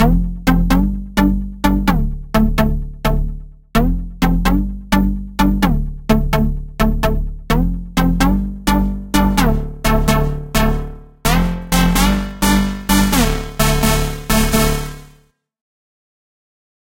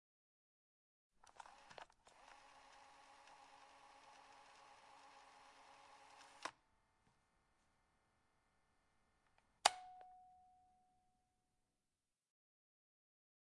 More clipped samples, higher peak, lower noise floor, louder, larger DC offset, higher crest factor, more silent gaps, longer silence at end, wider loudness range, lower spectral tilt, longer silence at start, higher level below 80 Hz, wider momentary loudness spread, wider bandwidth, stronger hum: neither; first, 0 dBFS vs -14 dBFS; second, -52 dBFS vs under -90 dBFS; first, -17 LUFS vs -43 LUFS; neither; second, 16 dB vs 42 dB; neither; second, 1.8 s vs 2.7 s; second, 3 LU vs 17 LU; first, -5 dB/octave vs 1 dB/octave; second, 0 s vs 1.2 s; first, -20 dBFS vs -88 dBFS; second, 6 LU vs 23 LU; first, 17 kHz vs 11 kHz; neither